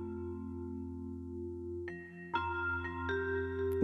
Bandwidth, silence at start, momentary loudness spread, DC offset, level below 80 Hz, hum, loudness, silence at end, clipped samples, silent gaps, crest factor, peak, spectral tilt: 13 kHz; 0 s; 8 LU; under 0.1%; -56 dBFS; none; -39 LUFS; 0 s; under 0.1%; none; 28 dB; -10 dBFS; -8 dB/octave